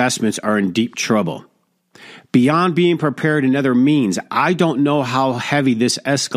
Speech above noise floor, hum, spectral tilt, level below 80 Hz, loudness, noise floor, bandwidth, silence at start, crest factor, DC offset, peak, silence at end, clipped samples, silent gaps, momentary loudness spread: 37 dB; none; -5 dB/octave; -62 dBFS; -17 LUFS; -54 dBFS; 15 kHz; 0 s; 16 dB; under 0.1%; -2 dBFS; 0 s; under 0.1%; none; 4 LU